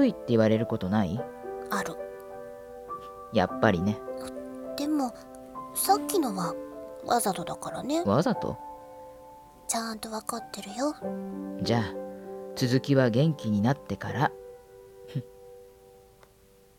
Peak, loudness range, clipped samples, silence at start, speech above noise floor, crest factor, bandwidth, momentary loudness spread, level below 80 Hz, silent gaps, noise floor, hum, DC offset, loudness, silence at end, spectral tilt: -6 dBFS; 5 LU; under 0.1%; 0 s; 31 dB; 24 dB; 17.5 kHz; 19 LU; -60 dBFS; none; -58 dBFS; none; under 0.1%; -29 LUFS; 0.9 s; -5.5 dB/octave